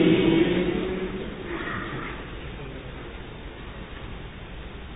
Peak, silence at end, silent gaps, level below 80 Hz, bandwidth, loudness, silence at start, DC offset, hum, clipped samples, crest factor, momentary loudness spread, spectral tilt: -6 dBFS; 0 s; none; -42 dBFS; 4 kHz; -27 LUFS; 0 s; under 0.1%; none; under 0.1%; 20 dB; 19 LU; -11 dB/octave